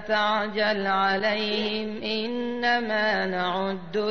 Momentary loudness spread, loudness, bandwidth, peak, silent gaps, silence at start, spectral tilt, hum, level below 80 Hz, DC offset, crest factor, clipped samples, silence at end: 6 LU; -25 LUFS; 6.6 kHz; -12 dBFS; none; 0 s; -5.5 dB/octave; none; -62 dBFS; 0.7%; 14 dB; under 0.1%; 0 s